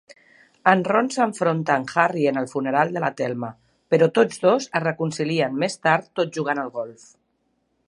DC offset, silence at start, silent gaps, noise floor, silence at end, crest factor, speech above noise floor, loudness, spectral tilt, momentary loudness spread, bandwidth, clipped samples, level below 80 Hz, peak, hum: under 0.1%; 0.65 s; none; -70 dBFS; 0.95 s; 22 dB; 49 dB; -22 LUFS; -5.5 dB/octave; 8 LU; 11 kHz; under 0.1%; -70 dBFS; -2 dBFS; none